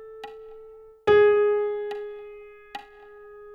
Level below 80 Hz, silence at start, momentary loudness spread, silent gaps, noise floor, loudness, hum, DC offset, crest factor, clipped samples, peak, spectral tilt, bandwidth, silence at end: -60 dBFS; 0 s; 26 LU; none; -47 dBFS; -22 LUFS; none; under 0.1%; 16 dB; under 0.1%; -8 dBFS; -6 dB/octave; 5.6 kHz; 0 s